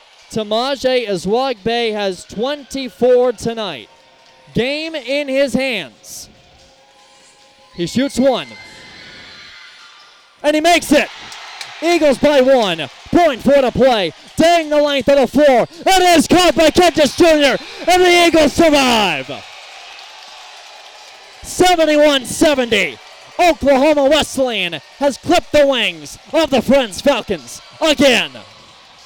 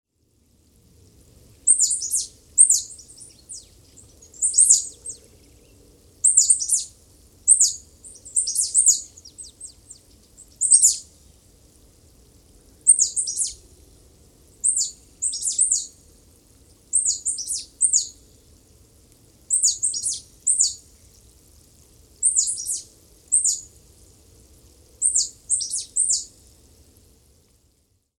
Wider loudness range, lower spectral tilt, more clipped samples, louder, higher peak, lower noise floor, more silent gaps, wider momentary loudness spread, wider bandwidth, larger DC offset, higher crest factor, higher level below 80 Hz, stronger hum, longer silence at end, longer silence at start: first, 10 LU vs 5 LU; first, -3.5 dB/octave vs 2 dB/octave; neither; first, -14 LUFS vs -18 LUFS; about the same, 0 dBFS vs 0 dBFS; second, -47 dBFS vs -65 dBFS; neither; about the same, 21 LU vs 23 LU; about the same, over 20 kHz vs 18.5 kHz; neither; second, 14 dB vs 24 dB; first, -42 dBFS vs -58 dBFS; neither; second, 0.65 s vs 1.95 s; second, 0.3 s vs 1.65 s